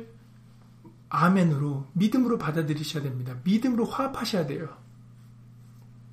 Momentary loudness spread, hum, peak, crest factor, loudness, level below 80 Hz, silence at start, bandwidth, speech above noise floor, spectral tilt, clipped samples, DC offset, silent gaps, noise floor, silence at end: 10 LU; none; -10 dBFS; 18 dB; -26 LUFS; -62 dBFS; 0 s; 15.5 kHz; 26 dB; -7 dB/octave; under 0.1%; under 0.1%; none; -52 dBFS; 0 s